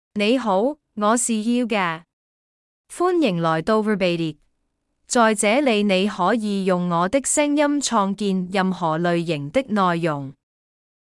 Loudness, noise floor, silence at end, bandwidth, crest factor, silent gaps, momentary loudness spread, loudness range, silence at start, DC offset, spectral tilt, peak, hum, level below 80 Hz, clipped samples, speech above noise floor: -20 LUFS; -72 dBFS; 0.8 s; 12 kHz; 16 dB; 2.13-2.84 s; 6 LU; 3 LU; 0.15 s; under 0.1%; -4.5 dB/octave; -6 dBFS; none; -60 dBFS; under 0.1%; 52 dB